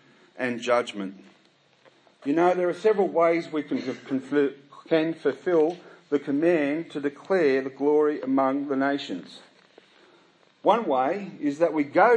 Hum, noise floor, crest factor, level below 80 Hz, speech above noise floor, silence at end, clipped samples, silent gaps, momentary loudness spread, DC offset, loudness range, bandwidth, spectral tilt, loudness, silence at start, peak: none; -60 dBFS; 20 dB; -84 dBFS; 36 dB; 0 s; under 0.1%; none; 9 LU; under 0.1%; 3 LU; 9.4 kHz; -6 dB/octave; -25 LUFS; 0.35 s; -6 dBFS